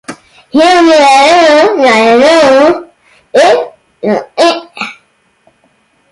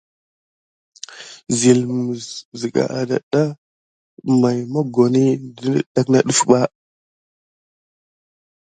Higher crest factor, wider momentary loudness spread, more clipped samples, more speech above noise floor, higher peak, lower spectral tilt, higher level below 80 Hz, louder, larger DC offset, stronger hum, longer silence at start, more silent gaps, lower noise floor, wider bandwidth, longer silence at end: second, 8 dB vs 20 dB; about the same, 16 LU vs 16 LU; neither; second, 47 dB vs over 73 dB; about the same, 0 dBFS vs 0 dBFS; second, -3 dB/octave vs -5.5 dB/octave; first, -50 dBFS vs -62 dBFS; first, -7 LUFS vs -18 LUFS; neither; neither; second, 0.1 s vs 1.1 s; second, none vs 2.45-2.52 s, 3.23-3.31 s, 3.58-4.17 s, 5.86-5.95 s; second, -52 dBFS vs under -90 dBFS; first, 11.5 kHz vs 9.6 kHz; second, 1.2 s vs 1.95 s